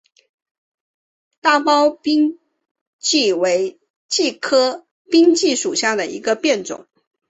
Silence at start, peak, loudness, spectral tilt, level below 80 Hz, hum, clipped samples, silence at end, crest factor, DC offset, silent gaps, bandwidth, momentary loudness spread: 1.45 s; -2 dBFS; -17 LUFS; -2 dB/octave; -66 dBFS; none; under 0.1%; 0.5 s; 16 dB; under 0.1%; 2.71-2.75 s, 2.81-2.99 s, 3.90-4.09 s, 4.91-5.05 s; 8.2 kHz; 8 LU